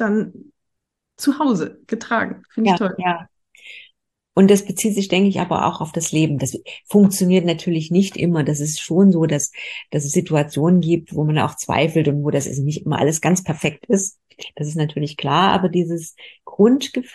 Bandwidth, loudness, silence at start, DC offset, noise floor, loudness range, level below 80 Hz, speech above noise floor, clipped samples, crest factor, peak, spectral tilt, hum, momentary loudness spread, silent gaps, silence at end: 12.5 kHz; -19 LUFS; 0 s; under 0.1%; -78 dBFS; 4 LU; -56 dBFS; 60 dB; under 0.1%; 16 dB; -2 dBFS; -5.5 dB/octave; none; 12 LU; none; 0.05 s